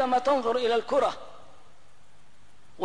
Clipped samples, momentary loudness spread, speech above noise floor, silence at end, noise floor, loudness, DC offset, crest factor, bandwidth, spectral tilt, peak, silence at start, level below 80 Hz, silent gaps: under 0.1%; 16 LU; 35 dB; 0 s; -61 dBFS; -26 LUFS; 0.8%; 14 dB; 10.5 kHz; -4 dB/octave; -14 dBFS; 0 s; -64 dBFS; none